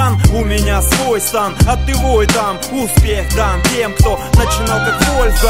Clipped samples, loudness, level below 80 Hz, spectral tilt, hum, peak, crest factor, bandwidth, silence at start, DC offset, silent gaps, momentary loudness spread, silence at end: under 0.1%; -13 LUFS; -16 dBFS; -4.5 dB/octave; none; 0 dBFS; 12 dB; 16.5 kHz; 0 s; 1%; none; 3 LU; 0 s